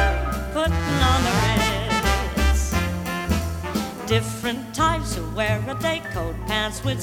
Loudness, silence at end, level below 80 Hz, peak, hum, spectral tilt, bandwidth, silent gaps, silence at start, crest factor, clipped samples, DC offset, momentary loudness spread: -23 LUFS; 0 s; -28 dBFS; -4 dBFS; none; -4.5 dB/octave; 18.5 kHz; none; 0 s; 18 dB; under 0.1%; under 0.1%; 8 LU